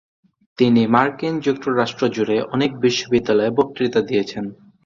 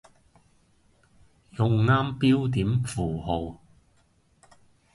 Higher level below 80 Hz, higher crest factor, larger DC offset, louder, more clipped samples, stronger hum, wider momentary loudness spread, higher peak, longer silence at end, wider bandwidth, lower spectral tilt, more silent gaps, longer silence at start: second, -56 dBFS vs -48 dBFS; about the same, 18 dB vs 18 dB; neither; first, -19 LUFS vs -25 LUFS; neither; neither; second, 6 LU vs 9 LU; first, 0 dBFS vs -10 dBFS; second, 0.35 s vs 1.4 s; second, 7.4 kHz vs 11.5 kHz; about the same, -6 dB/octave vs -7 dB/octave; neither; second, 0.6 s vs 1.55 s